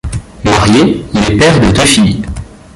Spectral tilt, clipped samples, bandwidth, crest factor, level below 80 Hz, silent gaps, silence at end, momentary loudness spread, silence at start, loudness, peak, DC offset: -4.5 dB/octave; 0.1%; 13 kHz; 10 dB; -24 dBFS; none; 0.3 s; 14 LU; 0.05 s; -9 LUFS; 0 dBFS; under 0.1%